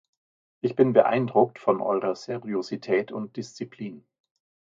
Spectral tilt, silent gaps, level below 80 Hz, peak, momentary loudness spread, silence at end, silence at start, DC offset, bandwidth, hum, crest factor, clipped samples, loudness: -7 dB/octave; none; -74 dBFS; -4 dBFS; 16 LU; 0.8 s; 0.65 s; under 0.1%; 7.6 kHz; none; 22 dB; under 0.1%; -25 LUFS